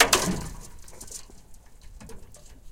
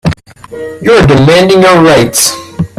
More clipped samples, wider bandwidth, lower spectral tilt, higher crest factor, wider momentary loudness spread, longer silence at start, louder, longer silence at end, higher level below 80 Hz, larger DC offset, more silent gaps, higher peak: second, under 0.1% vs 0.4%; second, 17 kHz vs over 20 kHz; second, -2 dB/octave vs -4.5 dB/octave; first, 28 dB vs 6 dB; first, 27 LU vs 17 LU; about the same, 0 s vs 0.05 s; second, -27 LUFS vs -6 LUFS; about the same, 0 s vs 0.1 s; second, -44 dBFS vs -30 dBFS; neither; neither; about the same, -2 dBFS vs 0 dBFS